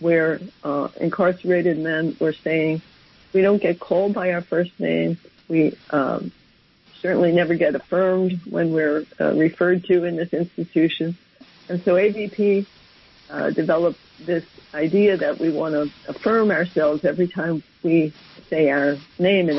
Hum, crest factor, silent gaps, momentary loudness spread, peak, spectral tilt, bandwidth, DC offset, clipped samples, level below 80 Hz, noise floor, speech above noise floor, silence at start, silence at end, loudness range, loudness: none; 14 dB; none; 8 LU; -8 dBFS; -9.5 dB/octave; 6 kHz; under 0.1%; under 0.1%; -62 dBFS; -56 dBFS; 35 dB; 0 s; 0 s; 2 LU; -21 LUFS